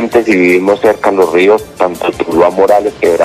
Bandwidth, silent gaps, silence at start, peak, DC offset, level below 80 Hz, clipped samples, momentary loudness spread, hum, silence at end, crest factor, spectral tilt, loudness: 15 kHz; none; 0 s; 0 dBFS; under 0.1%; -42 dBFS; 0.3%; 6 LU; none; 0 s; 10 dB; -5.5 dB/octave; -10 LUFS